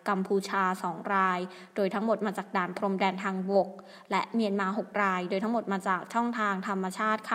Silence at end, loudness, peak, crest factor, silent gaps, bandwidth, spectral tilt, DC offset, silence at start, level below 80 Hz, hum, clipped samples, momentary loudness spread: 0 s; -30 LUFS; -12 dBFS; 18 dB; none; 15.5 kHz; -6 dB/octave; under 0.1%; 0.05 s; -82 dBFS; none; under 0.1%; 5 LU